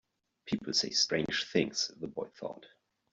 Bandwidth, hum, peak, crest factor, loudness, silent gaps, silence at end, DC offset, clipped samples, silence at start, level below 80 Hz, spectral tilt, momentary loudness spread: 8.2 kHz; none; -14 dBFS; 22 dB; -32 LUFS; none; 0.45 s; under 0.1%; under 0.1%; 0.45 s; -68 dBFS; -2.5 dB/octave; 15 LU